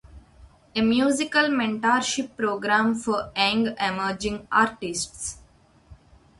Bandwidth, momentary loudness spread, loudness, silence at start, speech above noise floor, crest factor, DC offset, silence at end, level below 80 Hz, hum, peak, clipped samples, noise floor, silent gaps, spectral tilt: 11.5 kHz; 8 LU; -24 LUFS; 0.15 s; 32 dB; 18 dB; under 0.1%; 0.45 s; -52 dBFS; none; -6 dBFS; under 0.1%; -56 dBFS; none; -3 dB/octave